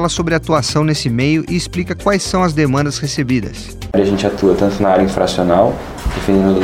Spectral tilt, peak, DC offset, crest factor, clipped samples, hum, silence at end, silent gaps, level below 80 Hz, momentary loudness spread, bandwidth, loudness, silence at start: -5.5 dB/octave; 0 dBFS; under 0.1%; 14 dB; under 0.1%; none; 0 s; none; -32 dBFS; 6 LU; 16 kHz; -15 LUFS; 0 s